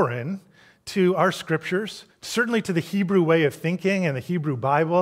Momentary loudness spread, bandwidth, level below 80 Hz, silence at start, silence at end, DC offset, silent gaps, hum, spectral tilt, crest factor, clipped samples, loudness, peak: 12 LU; 16 kHz; -66 dBFS; 0 s; 0 s; under 0.1%; none; none; -6 dB/octave; 18 dB; under 0.1%; -23 LUFS; -6 dBFS